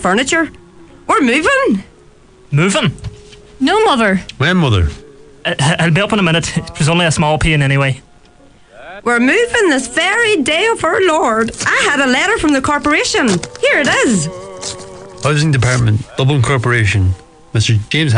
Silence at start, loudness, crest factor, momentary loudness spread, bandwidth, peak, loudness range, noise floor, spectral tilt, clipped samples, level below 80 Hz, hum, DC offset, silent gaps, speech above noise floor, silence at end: 0 s; -13 LUFS; 12 dB; 10 LU; 10.5 kHz; -2 dBFS; 3 LU; -44 dBFS; -4.5 dB/octave; under 0.1%; -32 dBFS; none; under 0.1%; none; 31 dB; 0 s